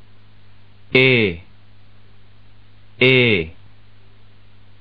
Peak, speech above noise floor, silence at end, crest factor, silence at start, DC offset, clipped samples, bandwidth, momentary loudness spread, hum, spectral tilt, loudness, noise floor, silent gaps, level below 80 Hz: 0 dBFS; 35 dB; 1.3 s; 20 dB; 0.9 s; 1%; under 0.1%; 5.2 kHz; 14 LU; 50 Hz at -50 dBFS; -3.5 dB/octave; -15 LUFS; -50 dBFS; none; -50 dBFS